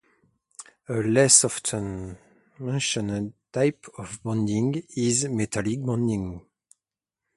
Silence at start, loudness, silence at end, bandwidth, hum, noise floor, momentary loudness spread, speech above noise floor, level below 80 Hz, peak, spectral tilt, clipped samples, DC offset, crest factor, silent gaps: 0.6 s; -24 LUFS; 0.95 s; 11.5 kHz; none; -88 dBFS; 22 LU; 64 dB; -54 dBFS; -2 dBFS; -4 dB/octave; under 0.1%; under 0.1%; 26 dB; none